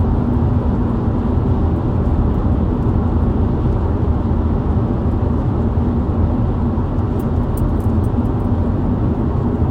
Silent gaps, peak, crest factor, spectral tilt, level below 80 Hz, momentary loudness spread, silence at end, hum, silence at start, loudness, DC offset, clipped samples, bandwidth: none; -4 dBFS; 12 dB; -10.5 dB/octave; -22 dBFS; 1 LU; 0 s; none; 0 s; -18 LUFS; under 0.1%; under 0.1%; 16 kHz